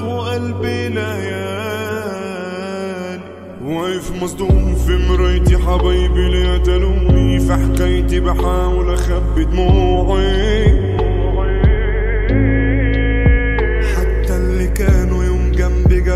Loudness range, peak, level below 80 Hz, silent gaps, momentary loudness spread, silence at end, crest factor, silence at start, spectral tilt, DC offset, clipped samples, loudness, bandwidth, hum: 7 LU; 0 dBFS; -16 dBFS; none; 9 LU; 0 s; 12 dB; 0 s; -7 dB/octave; under 0.1%; under 0.1%; -16 LUFS; 13.5 kHz; none